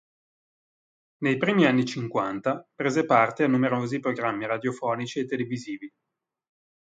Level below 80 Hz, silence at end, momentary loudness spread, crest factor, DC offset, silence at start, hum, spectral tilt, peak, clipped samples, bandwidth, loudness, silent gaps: -70 dBFS; 0.95 s; 9 LU; 22 dB; under 0.1%; 1.2 s; none; -6 dB/octave; -6 dBFS; under 0.1%; 9 kHz; -25 LUFS; none